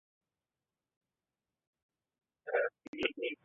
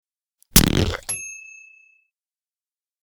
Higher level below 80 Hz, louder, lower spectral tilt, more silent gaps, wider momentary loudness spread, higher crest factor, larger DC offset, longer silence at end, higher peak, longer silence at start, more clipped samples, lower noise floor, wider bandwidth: second, -78 dBFS vs -34 dBFS; second, -36 LUFS vs -19 LUFS; second, 2 dB/octave vs -3.5 dB/octave; first, 2.88-2.93 s vs none; second, 5 LU vs 22 LU; about the same, 28 dB vs 24 dB; neither; second, 0.1 s vs 1.6 s; second, -14 dBFS vs 0 dBFS; first, 2.45 s vs 0.55 s; neither; about the same, under -90 dBFS vs under -90 dBFS; second, 3.9 kHz vs over 20 kHz